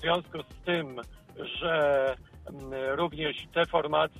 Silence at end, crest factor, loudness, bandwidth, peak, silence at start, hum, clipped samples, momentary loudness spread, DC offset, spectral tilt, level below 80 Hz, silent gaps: 0 s; 18 dB; -29 LUFS; 14 kHz; -12 dBFS; 0 s; none; under 0.1%; 16 LU; under 0.1%; -6 dB/octave; -54 dBFS; none